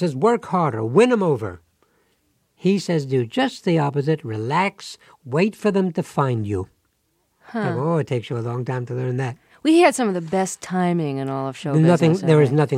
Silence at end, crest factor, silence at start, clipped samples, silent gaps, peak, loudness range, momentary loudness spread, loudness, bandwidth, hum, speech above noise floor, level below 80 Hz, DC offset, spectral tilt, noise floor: 0 s; 18 dB; 0 s; under 0.1%; none; -2 dBFS; 5 LU; 11 LU; -21 LUFS; 13 kHz; none; 48 dB; -64 dBFS; under 0.1%; -6.5 dB/octave; -68 dBFS